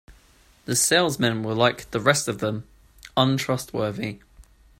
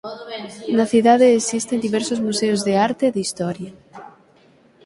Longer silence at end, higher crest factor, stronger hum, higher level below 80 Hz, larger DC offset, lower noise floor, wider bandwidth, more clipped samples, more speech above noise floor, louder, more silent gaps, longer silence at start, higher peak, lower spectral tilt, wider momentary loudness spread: second, 0.35 s vs 0.75 s; about the same, 22 dB vs 18 dB; neither; first, -54 dBFS vs -62 dBFS; neither; about the same, -56 dBFS vs -53 dBFS; first, 16 kHz vs 11.5 kHz; neither; about the same, 33 dB vs 35 dB; second, -23 LUFS vs -18 LUFS; neither; about the same, 0.1 s vs 0.05 s; about the same, -2 dBFS vs -2 dBFS; about the same, -3.5 dB/octave vs -4.5 dB/octave; second, 14 LU vs 18 LU